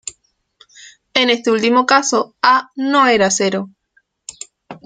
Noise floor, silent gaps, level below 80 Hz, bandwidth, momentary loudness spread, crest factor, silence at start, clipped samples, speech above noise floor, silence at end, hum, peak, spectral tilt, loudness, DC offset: -61 dBFS; none; -58 dBFS; 9.6 kHz; 21 LU; 16 dB; 0.05 s; under 0.1%; 47 dB; 0.1 s; none; 0 dBFS; -2.5 dB/octave; -14 LUFS; under 0.1%